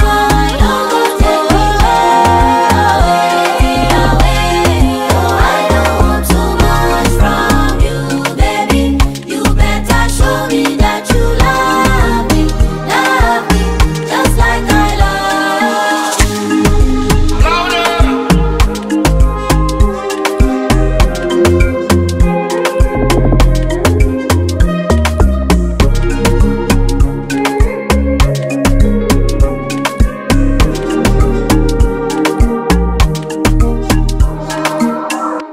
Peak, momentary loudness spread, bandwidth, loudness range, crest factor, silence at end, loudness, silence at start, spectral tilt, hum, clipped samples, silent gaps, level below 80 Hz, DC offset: 0 dBFS; 4 LU; 16 kHz; 3 LU; 10 dB; 0 s; -12 LUFS; 0 s; -5.5 dB/octave; none; 0.1%; none; -14 dBFS; under 0.1%